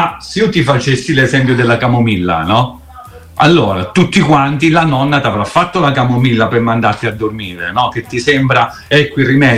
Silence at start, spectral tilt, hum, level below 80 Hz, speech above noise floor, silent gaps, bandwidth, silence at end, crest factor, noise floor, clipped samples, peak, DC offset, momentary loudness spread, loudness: 0 s; -6 dB/octave; none; -40 dBFS; 22 dB; none; 13.5 kHz; 0 s; 12 dB; -34 dBFS; under 0.1%; 0 dBFS; under 0.1%; 6 LU; -12 LUFS